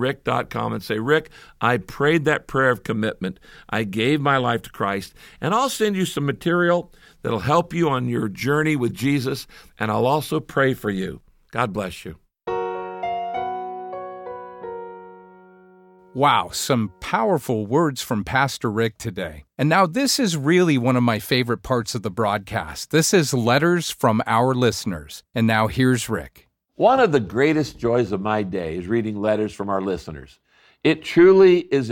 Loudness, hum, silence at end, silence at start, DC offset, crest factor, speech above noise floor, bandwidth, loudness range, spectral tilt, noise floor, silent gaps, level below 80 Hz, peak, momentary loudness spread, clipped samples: -21 LUFS; none; 0 s; 0 s; under 0.1%; 18 dB; 30 dB; 17 kHz; 6 LU; -5 dB/octave; -50 dBFS; none; -50 dBFS; -4 dBFS; 14 LU; under 0.1%